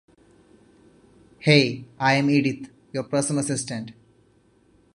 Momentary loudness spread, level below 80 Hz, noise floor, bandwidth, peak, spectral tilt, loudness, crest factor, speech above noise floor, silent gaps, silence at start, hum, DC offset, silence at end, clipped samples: 16 LU; -64 dBFS; -60 dBFS; 11.5 kHz; -2 dBFS; -4.5 dB/octave; -23 LUFS; 22 dB; 38 dB; none; 1.4 s; none; under 0.1%; 1.05 s; under 0.1%